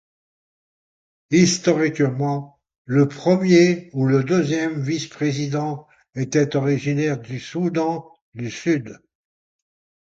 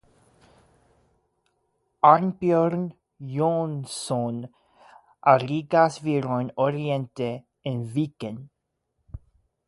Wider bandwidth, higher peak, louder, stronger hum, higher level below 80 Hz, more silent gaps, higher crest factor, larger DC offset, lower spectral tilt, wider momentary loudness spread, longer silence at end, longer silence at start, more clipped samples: second, 9.2 kHz vs 11.5 kHz; about the same, -4 dBFS vs -2 dBFS; first, -20 LUFS vs -24 LUFS; neither; about the same, -60 dBFS vs -58 dBFS; first, 2.78-2.85 s, 8.22-8.32 s vs none; second, 18 dB vs 24 dB; neither; about the same, -6 dB/octave vs -6.5 dB/octave; second, 13 LU vs 18 LU; first, 1.15 s vs 0.5 s; second, 1.3 s vs 2.05 s; neither